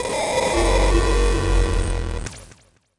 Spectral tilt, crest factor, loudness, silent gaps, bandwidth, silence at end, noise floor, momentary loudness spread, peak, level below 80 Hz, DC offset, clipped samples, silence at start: -4.5 dB/octave; 12 dB; -21 LUFS; none; 11.5 kHz; 0.5 s; -52 dBFS; 12 LU; -6 dBFS; -22 dBFS; under 0.1%; under 0.1%; 0 s